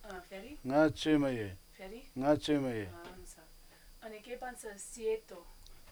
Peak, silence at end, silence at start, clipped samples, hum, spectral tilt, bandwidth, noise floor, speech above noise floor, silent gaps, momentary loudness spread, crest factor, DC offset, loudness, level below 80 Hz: -14 dBFS; 0 s; 0 s; under 0.1%; none; -5.5 dB/octave; over 20 kHz; -58 dBFS; 24 dB; none; 21 LU; 22 dB; under 0.1%; -35 LUFS; -56 dBFS